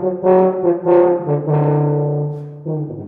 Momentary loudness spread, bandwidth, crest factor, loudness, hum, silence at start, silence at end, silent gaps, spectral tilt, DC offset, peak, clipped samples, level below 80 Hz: 11 LU; 3.4 kHz; 14 dB; -16 LUFS; none; 0 s; 0 s; none; -13 dB/octave; under 0.1%; -2 dBFS; under 0.1%; -56 dBFS